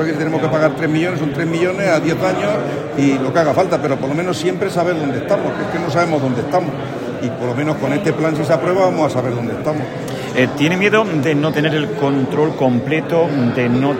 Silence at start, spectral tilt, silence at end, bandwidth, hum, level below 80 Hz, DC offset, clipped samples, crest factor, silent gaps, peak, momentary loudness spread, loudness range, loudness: 0 s; -6.5 dB/octave; 0 s; 16.5 kHz; none; -52 dBFS; under 0.1%; under 0.1%; 16 dB; none; 0 dBFS; 6 LU; 3 LU; -17 LUFS